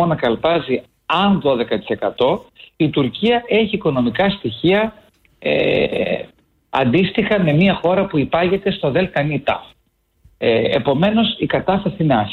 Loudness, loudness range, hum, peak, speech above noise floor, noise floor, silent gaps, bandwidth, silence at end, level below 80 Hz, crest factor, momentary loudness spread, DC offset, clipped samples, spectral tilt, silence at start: -17 LUFS; 2 LU; none; -4 dBFS; 46 dB; -63 dBFS; none; 5.2 kHz; 0 s; -46 dBFS; 14 dB; 7 LU; under 0.1%; under 0.1%; -8.5 dB/octave; 0 s